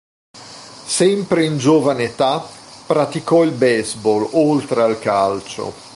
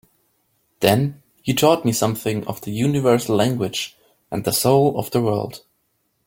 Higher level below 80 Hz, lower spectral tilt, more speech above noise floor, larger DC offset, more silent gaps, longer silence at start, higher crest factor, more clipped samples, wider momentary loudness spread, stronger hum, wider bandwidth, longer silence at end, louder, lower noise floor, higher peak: about the same, -56 dBFS vs -54 dBFS; about the same, -5 dB/octave vs -5 dB/octave; second, 21 dB vs 50 dB; neither; neither; second, 0.35 s vs 0.8 s; second, 14 dB vs 20 dB; neither; first, 18 LU vs 11 LU; neither; second, 11.5 kHz vs 17 kHz; second, 0 s vs 0.7 s; first, -17 LUFS vs -20 LUFS; second, -37 dBFS vs -69 dBFS; about the same, -2 dBFS vs 0 dBFS